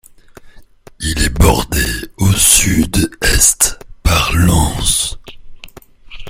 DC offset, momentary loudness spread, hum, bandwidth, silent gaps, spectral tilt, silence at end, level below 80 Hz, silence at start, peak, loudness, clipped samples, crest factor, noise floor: under 0.1%; 10 LU; none; over 20 kHz; none; -3 dB/octave; 0 s; -22 dBFS; 0.45 s; 0 dBFS; -12 LUFS; under 0.1%; 14 dB; -39 dBFS